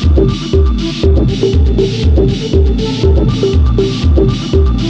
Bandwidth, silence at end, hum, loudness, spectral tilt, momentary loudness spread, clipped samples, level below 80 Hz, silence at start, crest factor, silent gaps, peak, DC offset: 7.8 kHz; 0 s; none; -12 LUFS; -7.5 dB/octave; 2 LU; under 0.1%; -14 dBFS; 0 s; 10 dB; none; 0 dBFS; under 0.1%